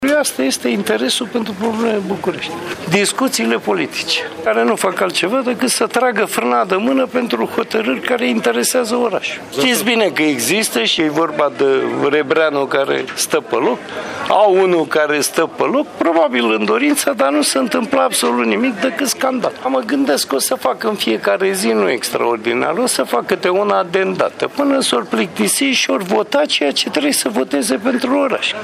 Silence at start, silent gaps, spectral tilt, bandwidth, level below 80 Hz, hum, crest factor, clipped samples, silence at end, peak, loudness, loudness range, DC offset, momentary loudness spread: 0 s; none; -3 dB/octave; 15.5 kHz; -62 dBFS; none; 16 dB; under 0.1%; 0 s; 0 dBFS; -16 LUFS; 2 LU; under 0.1%; 4 LU